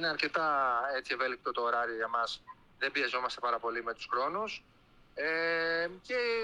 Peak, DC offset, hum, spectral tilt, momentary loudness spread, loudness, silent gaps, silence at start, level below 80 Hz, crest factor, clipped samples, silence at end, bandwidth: -16 dBFS; under 0.1%; none; -3 dB/octave; 7 LU; -33 LUFS; none; 0 s; -68 dBFS; 16 dB; under 0.1%; 0 s; 11.5 kHz